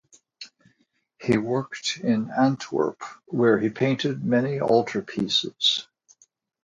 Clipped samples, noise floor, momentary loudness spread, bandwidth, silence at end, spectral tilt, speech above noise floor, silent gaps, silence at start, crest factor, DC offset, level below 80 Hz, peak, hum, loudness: under 0.1%; -69 dBFS; 12 LU; 9.4 kHz; 0.8 s; -5 dB/octave; 45 dB; none; 0.4 s; 20 dB; under 0.1%; -64 dBFS; -6 dBFS; none; -24 LUFS